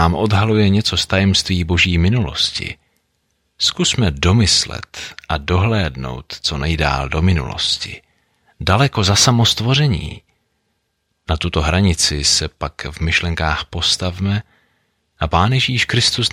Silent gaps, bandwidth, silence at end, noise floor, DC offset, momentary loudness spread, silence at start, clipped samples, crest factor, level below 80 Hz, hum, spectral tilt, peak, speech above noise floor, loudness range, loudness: none; 16 kHz; 0 s; -69 dBFS; under 0.1%; 12 LU; 0 s; under 0.1%; 16 dB; -32 dBFS; none; -4 dB/octave; 0 dBFS; 53 dB; 3 LU; -16 LUFS